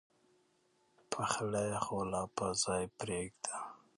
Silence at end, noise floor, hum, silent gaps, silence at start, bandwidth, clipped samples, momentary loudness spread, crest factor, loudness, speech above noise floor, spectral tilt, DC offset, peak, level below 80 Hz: 0.2 s; -74 dBFS; none; none; 1.1 s; 11.5 kHz; under 0.1%; 7 LU; 24 dB; -37 LUFS; 37 dB; -3.5 dB/octave; under 0.1%; -14 dBFS; -64 dBFS